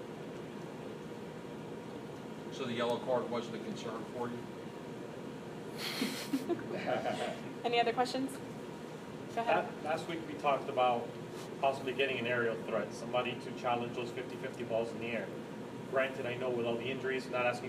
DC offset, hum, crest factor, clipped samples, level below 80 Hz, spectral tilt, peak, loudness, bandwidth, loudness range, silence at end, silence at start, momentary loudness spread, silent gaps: under 0.1%; none; 20 dB; under 0.1%; -72 dBFS; -5 dB/octave; -18 dBFS; -37 LUFS; 15.5 kHz; 5 LU; 0 s; 0 s; 12 LU; none